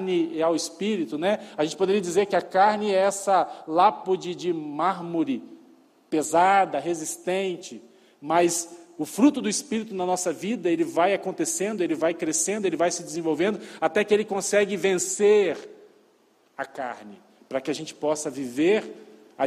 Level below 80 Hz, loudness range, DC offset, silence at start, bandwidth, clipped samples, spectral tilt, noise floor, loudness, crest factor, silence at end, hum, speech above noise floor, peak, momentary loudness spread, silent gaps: -74 dBFS; 3 LU; under 0.1%; 0 s; 15 kHz; under 0.1%; -3.5 dB/octave; -62 dBFS; -24 LUFS; 18 dB; 0 s; none; 38 dB; -6 dBFS; 11 LU; none